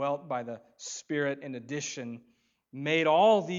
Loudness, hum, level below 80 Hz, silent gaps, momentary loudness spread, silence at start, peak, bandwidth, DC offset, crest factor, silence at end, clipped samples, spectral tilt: -29 LUFS; none; -84 dBFS; none; 20 LU; 0 s; -12 dBFS; 7.8 kHz; under 0.1%; 18 dB; 0 s; under 0.1%; -4 dB/octave